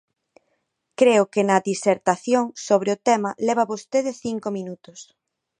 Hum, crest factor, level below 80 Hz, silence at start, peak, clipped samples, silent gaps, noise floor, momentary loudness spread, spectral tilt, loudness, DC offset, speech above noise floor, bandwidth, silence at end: none; 20 dB; -70 dBFS; 1 s; -2 dBFS; under 0.1%; none; -73 dBFS; 12 LU; -4.5 dB/octave; -21 LUFS; under 0.1%; 52 dB; 10.5 kHz; 0.55 s